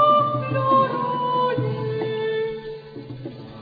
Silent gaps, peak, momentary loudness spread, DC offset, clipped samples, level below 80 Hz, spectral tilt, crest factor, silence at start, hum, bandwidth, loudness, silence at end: none; -8 dBFS; 17 LU; under 0.1%; under 0.1%; -60 dBFS; -9.5 dB/octave; 14 dB; 0 s; none; 5 kHz; -22 LUFS; 0 s